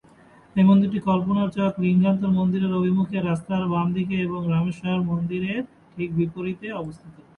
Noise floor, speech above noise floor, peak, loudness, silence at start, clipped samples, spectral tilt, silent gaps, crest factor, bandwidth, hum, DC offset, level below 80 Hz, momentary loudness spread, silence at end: -52 dBFS; 30 dB; -6 dBFS; -23 LUFS; 0.55 s; under 0.1%; -9 dB/octave; none; 16 dB; 4.1 kHz; none; under 0.1%; -56 dBFS; 11 LU; 0.25 s